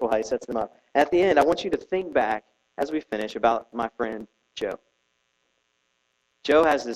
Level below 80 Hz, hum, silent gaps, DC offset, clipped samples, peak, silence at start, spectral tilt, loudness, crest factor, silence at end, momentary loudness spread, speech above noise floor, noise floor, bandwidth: -58 dBFS; none; none; under 0.1%; under 0.1%; -6 dBFS; 0 s; -4.5 dB/octave; -25 LUFS; 20 dB; 0 s; 13 LU; 48 dB; -72 dBFS; 14.5 kHz